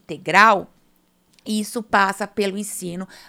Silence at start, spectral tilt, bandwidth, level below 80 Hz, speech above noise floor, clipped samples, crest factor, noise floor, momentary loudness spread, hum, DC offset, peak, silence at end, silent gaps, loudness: 0.1 s; -3.5 dB/octave; 17 kHz; -62 dBFS; 41 dB; under 0.1%; 22 dB; -61 dBFS; 15 LU; none; under 0.1%; 0 dBFS; 0.15 s; none; -19 LUFS